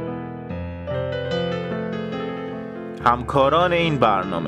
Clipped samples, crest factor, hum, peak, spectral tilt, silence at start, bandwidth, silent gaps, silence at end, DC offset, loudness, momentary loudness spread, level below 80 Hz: under 0.1%; 20 dB; none; -2 dBFS; -7 dB/octave; 0 s; 11.5 kHz; none; 0 s; under 0.1%; -22 LUFS; 13 LU; -46 dBFS